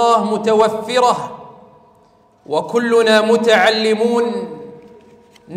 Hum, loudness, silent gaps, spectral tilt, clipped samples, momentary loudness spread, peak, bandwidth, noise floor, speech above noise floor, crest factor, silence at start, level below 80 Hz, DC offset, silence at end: none; -15 LUFS; none; -4 dB/octave; under 0.1%; 15 LU; -2 dBFS; 14.5 kHz; -52 dBFS; 37 dB; 14 dB; 0 s; -62 dBFS; under 0.1%; 0 s